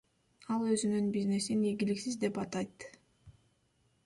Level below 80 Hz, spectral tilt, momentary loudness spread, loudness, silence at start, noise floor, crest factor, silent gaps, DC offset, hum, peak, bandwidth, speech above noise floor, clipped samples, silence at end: -70 dBFS; -5.5 dB/octave; 14 LU; -34 LUFS; 0.5 s; -73 dBFS; 16 dB; none; under 0.1%; none; -18 dBFS; 11.5 kHz; 40 dB; under 0.1%; 0.75 s